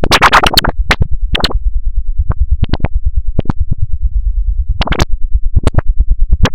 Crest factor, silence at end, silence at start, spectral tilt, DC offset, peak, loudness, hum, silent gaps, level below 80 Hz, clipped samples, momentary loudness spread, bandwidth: 12 dB; 0 s; 0 s; -4.5 dB/octave; 10%; 0 dBFS; -14 LUFS; none; none; -12 dBFS; 0.9%; 11 LU; 16.5 kHz